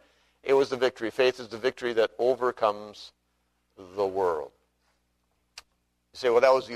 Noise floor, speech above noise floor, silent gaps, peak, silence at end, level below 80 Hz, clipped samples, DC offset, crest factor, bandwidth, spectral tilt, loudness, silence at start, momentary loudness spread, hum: -74 dBFS; 48 dB; none; -6 dBFS; 0 s; -68 dBFS; under 0.1%; under 0.1%; 22 dB; 13.5 kHz; -4.5 dB/octave; -26 LUFS; 0.45 s; 17 LU; 60 Hz at -65 dBFS